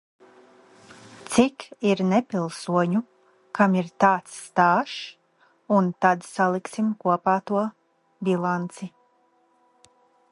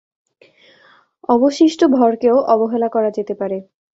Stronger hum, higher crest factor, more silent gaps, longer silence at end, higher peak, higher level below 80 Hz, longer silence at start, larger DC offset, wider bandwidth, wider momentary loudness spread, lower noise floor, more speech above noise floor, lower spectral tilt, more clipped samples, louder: neither; first, 22 dB vs 16 dB; neither; first, 1.45 s vs 0.35 s; about the same, -4 dBFS vs -2 dBFS; about the same, -68 dBFS vs -64 dBFS; about the same, 1.2 s vs 1.3 s; neither; first, 11.5 kHz vs 8 kHz; about the same, 12 LU vs 11 LU; first, -64 dBFS vs -52 dBFS; first, 41 dB vs 37 dB; about the same, -6 dB/octave vs -5.5 dB/octave; neither; second, -24 LUFS vs -16 LUFS